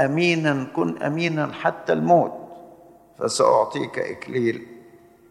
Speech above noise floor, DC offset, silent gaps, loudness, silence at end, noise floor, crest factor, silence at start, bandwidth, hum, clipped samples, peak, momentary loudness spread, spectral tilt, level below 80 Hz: 28 dB; under 0.1%; none; -22 LUFS; 0.5 s; -50 dBFS; 18 dB; 0 s; 12.5 kHz; none; under 0.1%; -4 dBFS; 11 LU; -5.5 dB/octave; -68 dBFS